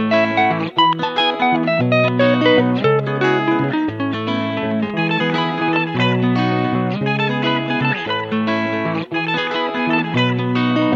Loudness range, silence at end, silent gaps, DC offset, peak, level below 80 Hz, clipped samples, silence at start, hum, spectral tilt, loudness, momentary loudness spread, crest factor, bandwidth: 3 LU; 0 s; none; under 0.1%; -2 dBFS; -60 dBFS; under 0.1%; 0 s; none; -7 dB/octave; -17 LUFS; 6 LU; 16 dB; 7.4 kHz